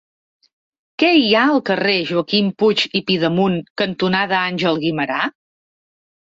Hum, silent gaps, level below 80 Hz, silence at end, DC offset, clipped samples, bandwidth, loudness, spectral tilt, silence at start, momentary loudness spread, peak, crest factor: none; 3.70-3.76 s; -60 dBFS; 1 s; under 0.1%; under 0.1%; 7.8 kHz; -17 LUFS; -6 dB/octave; 1 s; 7 LU; -2 dBFS; 16 dB